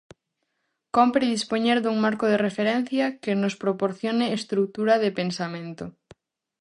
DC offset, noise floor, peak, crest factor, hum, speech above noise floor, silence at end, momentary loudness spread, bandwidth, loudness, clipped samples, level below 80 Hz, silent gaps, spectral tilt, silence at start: under 0.1%; -78 dBFS; -6 dBFS; 20 dB; none; 54 dB; 0.7 s; 9 LU; 11 kHz; -24 LUFS; under 0.1%; -66 dBFS; none; -5.5 dB/octave; 0.95 s